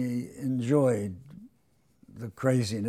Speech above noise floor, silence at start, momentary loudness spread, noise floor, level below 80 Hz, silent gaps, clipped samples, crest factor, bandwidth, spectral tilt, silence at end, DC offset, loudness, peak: 41 dB; 0 s; 18 LU; -68 dBFS; -68 dBFS; none; under 0.1%; 18 dB; 14 kHz; -7 dB/octave; 0 s; under 0.1%; -28 LUFS; -12 dBFS